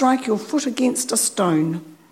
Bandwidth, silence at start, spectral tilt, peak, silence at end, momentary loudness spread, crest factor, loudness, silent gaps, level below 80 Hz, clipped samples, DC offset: 16 kHz; 0 s; -4 dB/octave; -6 dBFS; 0.15 s; 5 LU; 16 dB; -20 LUFS; none; -70 dBFS; under 0.1%; under 0.1%